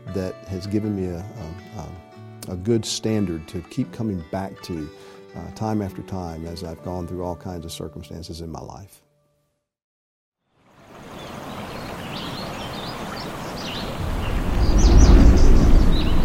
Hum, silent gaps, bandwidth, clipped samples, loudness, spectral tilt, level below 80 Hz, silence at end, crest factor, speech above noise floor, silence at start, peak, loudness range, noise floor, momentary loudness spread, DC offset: none; 9.84-10.32 s; 14.5 kHz; under 0.1%; -24 LUFS; -6 dB/octave; -22 dBFS; 0 s; 20 dB; 44 dB; 0.05 s; -2 dBFS; 18 LU; -71 dBFS; 20 LU; under 0.1%